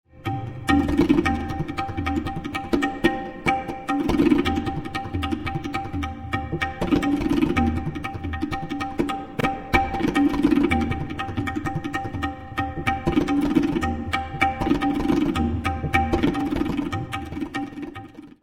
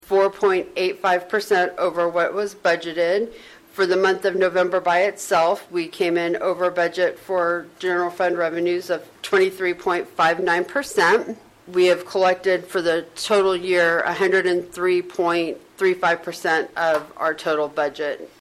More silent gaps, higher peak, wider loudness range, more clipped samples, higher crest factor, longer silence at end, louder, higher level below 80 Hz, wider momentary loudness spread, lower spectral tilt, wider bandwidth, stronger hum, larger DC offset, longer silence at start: neither; first, -4 dBFS vs -8 dBFS; about the same, 2 LU vs 2 LU; neither; first, 20 dB vs 12 dB; about the same, 0.15 s vs 0.15 s; second, -24 LUFS vs -21 LUFS; first, -36 dBFS vs -62 dBFS; first, 10 LU vs 6 LU; first, -6.5 dB/octave vs -4 dB/octave; first, 16 kHz vs 14.5 kHz; neither; neither; about the same, 0.15 s vs 0.1 s